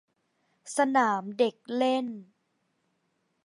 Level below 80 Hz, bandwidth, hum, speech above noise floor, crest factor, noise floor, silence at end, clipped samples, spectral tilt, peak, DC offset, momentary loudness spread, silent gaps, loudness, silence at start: -86 dBFS; 11.5 kHz; none; 48 dB; 20 dB; -76 dBFS; 1.2 s; under 0.1%; -4 dB/octave; -12 dBFS; under 0.1%; 11 LU; none; -27 LUFS; 0.65 s